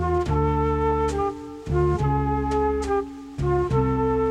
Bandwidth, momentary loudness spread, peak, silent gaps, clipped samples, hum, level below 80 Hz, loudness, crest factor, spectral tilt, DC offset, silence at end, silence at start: 10.5 kHz; 6 LU; -10 dBFS; none; under 0.1%; none; -32 dBFS; -23 LUFS; 12 dB; -8 dB/octave; under 0.1%; 0 s; 0 s